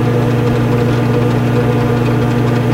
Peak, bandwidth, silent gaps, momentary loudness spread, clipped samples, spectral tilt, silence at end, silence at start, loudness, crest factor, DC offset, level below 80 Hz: 0 dBFS; 15.5 kHz; none; 0 LU; under 0.1%; -8 dB/octave; 0 s; 0 s; -13 LUFS; 12 dB; under 0.1%; -32 dBFS